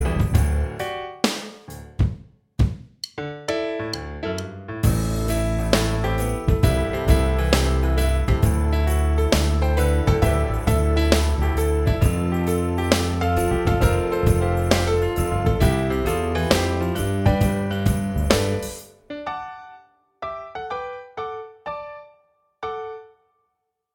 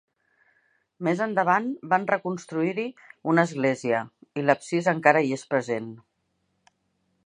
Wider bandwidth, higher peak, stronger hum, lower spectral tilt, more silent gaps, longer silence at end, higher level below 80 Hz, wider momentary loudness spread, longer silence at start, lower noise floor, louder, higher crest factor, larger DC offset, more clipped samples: first, 18 kHz vs 10.5 kHz; about the same, 0 dBFS vs -2 dBFS; neither; about the same, -6 dB/octave vs -6 dB/octave; neither; second, 0.9 s vs 1.25 s; first, -26 dBFS vs -76 dBFS; first, 14 LU vs 11 LU; second, 0 s vs 1 s; about the same, -76 dBFS vs -74 dBFS; first, -22 LUFS vs -25 LUFS; about the same, 22 dB vs 24 dB; neither; neither